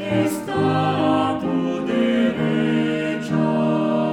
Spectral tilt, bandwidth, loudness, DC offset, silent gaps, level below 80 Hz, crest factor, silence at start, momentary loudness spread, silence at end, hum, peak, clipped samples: -6.5 dB/octave; 16.5 kHz; -20 LUFS; under 0.1%; none; -56 dBFS; 12 dB; 0 s; 3 LU; 0 s; none; -8 dBFS; under 0.1%